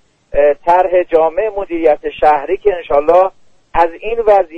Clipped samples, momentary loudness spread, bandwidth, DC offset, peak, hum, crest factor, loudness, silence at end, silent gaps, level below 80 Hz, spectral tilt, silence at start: under 0.1%; 7 LU; 6.2 kHz; under 0.1%; 0 dBFS; none; 12 dB; -13 LUFS; 0 s; none; -36 dBFS; -6.5 dB/octave; 0.3 s